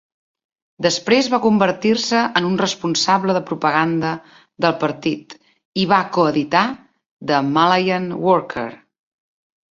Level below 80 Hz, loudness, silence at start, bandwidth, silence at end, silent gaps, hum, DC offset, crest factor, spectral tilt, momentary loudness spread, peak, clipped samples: -60 dBFS; -18 LUFS; 0.8 s; 7.8 kHz; 0.95 s; 5.65-5.72 s, 7.11-7.17 s; none; under 0.1%; 18 dB; -4.5 dB/octave; 10 LU; 0 dBFS; under 0.1%